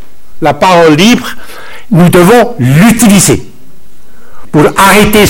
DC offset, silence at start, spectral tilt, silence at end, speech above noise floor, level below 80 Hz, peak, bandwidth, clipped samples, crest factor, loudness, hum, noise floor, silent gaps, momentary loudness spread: under 0.1%; 0 s; -5 dB/octave; 0 s; 36 dB; -30 dBFS; 0 dBFS; over 20 kHz; 5%; 6 dB; -5 LUFS; none; -40 dBFS; none; 10 LU